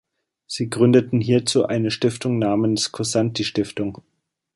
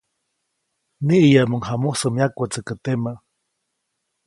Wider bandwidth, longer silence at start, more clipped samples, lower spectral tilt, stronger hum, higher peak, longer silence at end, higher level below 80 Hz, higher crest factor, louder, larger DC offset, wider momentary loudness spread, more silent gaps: about the same, 11.5 kHz vs 11.5 kHz; second, 0.5 s vs 1 s; neither; about the same, -5.5 dB/octave vs -6 dB/octave; neither; about the same, -2 dBFS vs -2 dBFS; second, 0.6 s vs 1.1 s; about the same, -56 dBFS vs -58 dBFS; about the same, 18 dB vs 20 dB; about the same, -20 LUFS vs -20 LUFS; neither; about the same, 11 LU vs 13 LU; neither